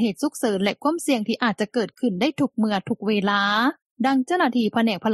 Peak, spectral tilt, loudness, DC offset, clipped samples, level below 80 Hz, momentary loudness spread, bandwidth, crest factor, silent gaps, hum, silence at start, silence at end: -6 dBFS; -5 dB/octave; -22 LUFS; under 0.1%; under 0.1%; -68 dBFS; 5 LU; 13.5 kHz; 16 dB; 3.82-3.96 s; none; 0 s; 0 s